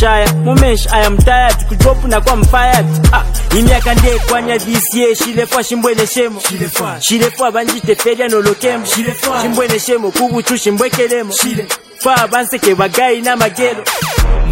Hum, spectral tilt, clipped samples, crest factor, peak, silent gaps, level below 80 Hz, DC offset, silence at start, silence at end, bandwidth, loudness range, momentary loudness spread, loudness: none; -4 dB/octave; 0.2%; 12 dB; 0 dBFS; none; -16 dBFS; under 0.1%; 0 s; 0 s; 17 kHz; 3 LU; 4 LU; -12 LUFS